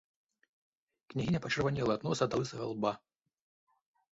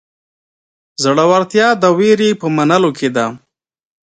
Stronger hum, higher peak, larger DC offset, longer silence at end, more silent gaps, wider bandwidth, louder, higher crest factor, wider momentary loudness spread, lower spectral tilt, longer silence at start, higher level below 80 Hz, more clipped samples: neither; second, -16 dBFS vs 0 dBFS; neither; first, 1.15 s vs 0.8 s; neither; second, 7.6 kHz vs 9.4 kHz; second, -34 LUFS vs -13 LUFS; first, 20 dB vs 14 dB; about the same, 6 LU vs 7 LU; about the same, -5.5 dB/octave vs -5 dB/octave; about the same, 1.1 s vs 1 s; about the same, -62 dBFS vs -62 dBFS; neither